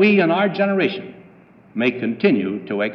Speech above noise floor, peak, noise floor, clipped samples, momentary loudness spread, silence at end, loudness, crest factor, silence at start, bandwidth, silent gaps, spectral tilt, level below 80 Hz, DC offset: 30 dB; -4 dBFS; -48 dBFS; under 0.1%; 14 LU; 0 s; -19 LUFS; 14 dB; 0 s; 5.8 kHz; none; -8.5 dB/octave; -70 dBFS; under 0.1%